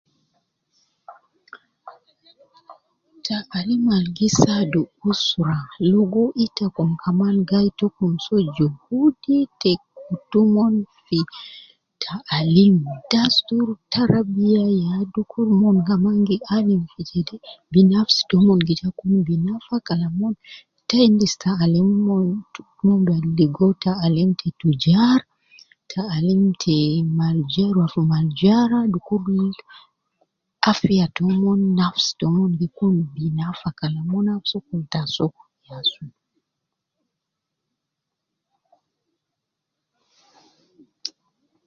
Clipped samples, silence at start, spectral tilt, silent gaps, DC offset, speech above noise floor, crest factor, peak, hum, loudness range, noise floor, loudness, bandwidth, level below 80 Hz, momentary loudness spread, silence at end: under 0.1%; 1.1 s; -6.5 dB/octave; none; under 0.1%; 63 dB; 20 dB; 0 dBFS; none; 7 LU; -82 dBFS; -19 LUFS; 7.4 kHz; -54 dBFS; 10 LU; 0.6 s